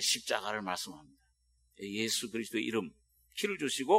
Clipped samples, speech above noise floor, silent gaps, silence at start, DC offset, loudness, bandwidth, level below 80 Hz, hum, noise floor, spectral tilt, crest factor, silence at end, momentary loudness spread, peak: under 0.1%; 39 dB; none; 0 s; under 0.1%; -35 LUFS; 16 kHz; -74 dBFS; none; -72 dBFS; -2 dB/octave; 22 dB; 0 s; 13 LU; -12 dBFS